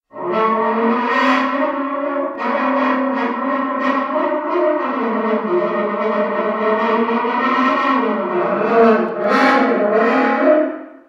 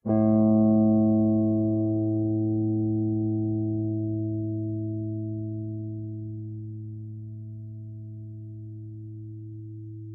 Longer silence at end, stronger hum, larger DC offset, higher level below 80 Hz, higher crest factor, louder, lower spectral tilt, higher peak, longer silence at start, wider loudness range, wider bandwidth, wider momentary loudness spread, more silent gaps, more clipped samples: first, 0.15 s vs 0 s; neither; neither; second, -72 dBFS vs -58 dBFS; about the same, 16 dB vs 14 dB; first, -17 LUFS vs -26 LUFS; second, -6.5 dB/octave vs -16 dB/octave; first, 0 dBFS vs -12 dBFS; about the same, 0.15 s vs 0.05 s; second, 3 LU vs 16 LU; first, 7.8 kHz vs 1.7 kHz; second, 6 LU vs 20 LU; neither; neither